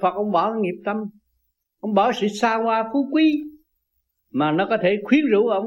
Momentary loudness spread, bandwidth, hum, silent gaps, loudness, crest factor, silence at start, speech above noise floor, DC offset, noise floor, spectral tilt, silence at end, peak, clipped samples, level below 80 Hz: 11 LU; 9 kHz; none; none; -21 LUFS; 16 dB; 0 s; 54 dB; under 0.1%; -74 dBFS; -6 dB/octave; 0 s; -6 dBFS; under 0.1%; -66 dBFS